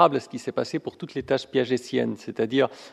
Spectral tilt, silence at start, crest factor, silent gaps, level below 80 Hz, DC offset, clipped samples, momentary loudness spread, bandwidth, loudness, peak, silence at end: -5.5 dB/octave; 0 s; 22 dB; none; -64 dBFS; under 0.1%; under 0.1%; 8 LU; 12.5 kHz; -26 LUFS; -4 dBFS; 0.05 s